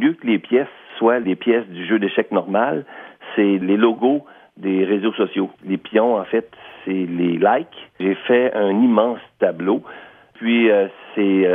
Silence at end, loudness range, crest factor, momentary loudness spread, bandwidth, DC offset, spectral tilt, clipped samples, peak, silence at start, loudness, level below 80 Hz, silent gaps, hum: 0 s; 2 LU; 18 dB; 10 LU; 3.8 kHz; under 0.1%; -9.5 dB/octave; under 0.1%; -2 dBFS; 0 s; -19 LUFS; -72 dBFS; none; none